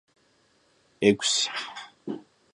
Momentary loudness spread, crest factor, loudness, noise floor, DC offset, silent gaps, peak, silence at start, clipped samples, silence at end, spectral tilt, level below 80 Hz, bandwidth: 17 LU; 24 dB; -24 LUFS; -65 dBFS; under 0.1%; none; -6 dBFS; 1 s; under 0.1%; 0.35 s; -3 dB/octave; -68 dBFS; 11.5 kHz